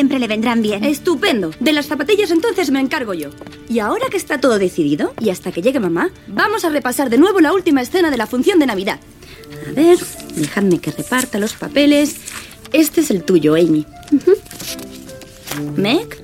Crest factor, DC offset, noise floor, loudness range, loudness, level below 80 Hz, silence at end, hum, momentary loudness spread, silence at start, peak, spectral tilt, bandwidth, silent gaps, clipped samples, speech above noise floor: 14 dB; under 0.1%; -35 dBFS; 3 LU; -16 LUFS; -48 dBFS; 0 s; none; 14 LU; 0 s; -2 dBFS; -4.5 dB/octave; 16.5 kHz; none; under 0.1%; 20 dB